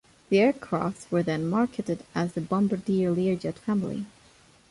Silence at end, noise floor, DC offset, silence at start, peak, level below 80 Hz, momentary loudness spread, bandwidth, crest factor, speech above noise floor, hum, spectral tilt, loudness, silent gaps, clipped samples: 0.65 s; -57 dBFS; under 0.1%; 0.3 s; -12 dBFS; -60 dBFS; 9 LU; 11.5 kHz; 16 dB; 31 dB; none; -7.5 dB/octave; -27 LUFS; none; under 0.1%